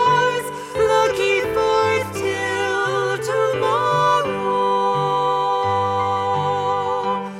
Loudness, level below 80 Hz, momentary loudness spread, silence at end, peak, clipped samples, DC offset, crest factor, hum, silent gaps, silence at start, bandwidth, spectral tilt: -19 LUFS; -52 dBFS; 4 LU; 0 s; -4 dBFS; under 0.1%; under 0.1%; 14 dB; none; none; 0 s; 16 kHz; -4.5 dB/octave